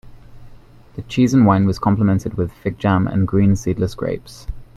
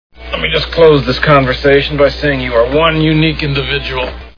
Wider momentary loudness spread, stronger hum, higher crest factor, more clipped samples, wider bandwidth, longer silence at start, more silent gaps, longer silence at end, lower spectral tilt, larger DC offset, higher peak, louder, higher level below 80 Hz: first, 17 LU vs 8 LU; neither; first, 18 dB vs 12 dB; second, under 0.1% vs 0.2%; first, 12.5 kHz vs 5.4 kHz; second, 0.05 s vs 0.2 s; neither; about the same, 0.1 s vs 0.05 s; about the same, -7.5 dB/octave vs -7 dB/octave; second, under 0.1% vs 0.4%; about the same, 0 dBFS vs 0 dBFS; second, -18 LUFS vs -11 LUFS; second, -40 dBFS vs -26 dBFS